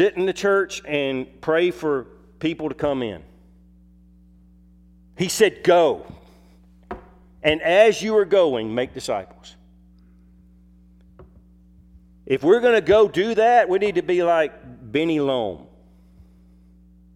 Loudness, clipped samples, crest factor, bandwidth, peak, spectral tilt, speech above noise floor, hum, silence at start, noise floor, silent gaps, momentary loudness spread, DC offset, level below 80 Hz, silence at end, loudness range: -20 LUFS; under 0.1%; 20 dB; 15 kHz; -2 dBFS; -4.5 dB/octave; 32 dB; none; 0 s; -51 dBFS; none; 13 LU; under 0.1%; -52 dBFS; 1.55 s; 10 LU